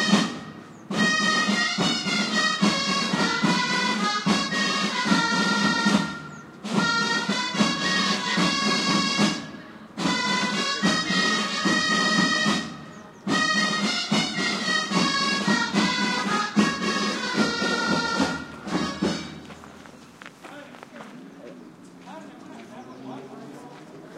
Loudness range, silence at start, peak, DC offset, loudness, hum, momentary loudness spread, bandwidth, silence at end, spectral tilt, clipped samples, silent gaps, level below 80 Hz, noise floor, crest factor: 14 LU; 0 s; -6 dBFS; under 0.1%; -23 LUFS; none; 21 LU; 13 kHz; 0 s; -3.5 dB/octave; under 0.1%; none; -60 dBFS; -46 dBFS; 18 dB